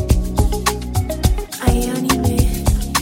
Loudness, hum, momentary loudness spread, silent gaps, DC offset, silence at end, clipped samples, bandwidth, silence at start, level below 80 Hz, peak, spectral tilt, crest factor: -19 LUFS; none; 3 LU; none; under 0.1%; 0 s; under 0.1%; 17 kHz; 0 s; -20 dBFS; -2 dBFS; -5 dB/octave; 16 dB